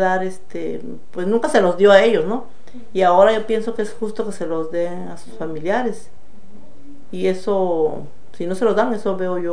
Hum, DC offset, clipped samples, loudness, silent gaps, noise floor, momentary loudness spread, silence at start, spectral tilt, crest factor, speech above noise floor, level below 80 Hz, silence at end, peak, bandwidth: none; 6%; under 0.1%; -19 LUFS; none; -47 dBFS; 17 LU; 0 s; -5.5 dB/octave; 20 dB; 28 dB; -56 dBFS; 0 s; 0 dBFS; 10 kHz